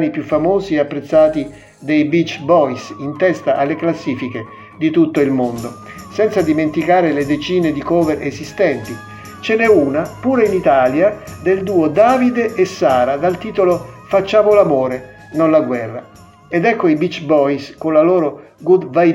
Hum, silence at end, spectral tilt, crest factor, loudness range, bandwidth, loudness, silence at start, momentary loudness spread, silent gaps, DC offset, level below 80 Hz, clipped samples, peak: none; 0 s; -6.5 dB/octave; 14 dB; 3 LU; 12.5 kHz; -15 LUFS; 0 s; 13 LU; none; under 0.1%; -48 dBFS; under 0.1%; 0 dBFS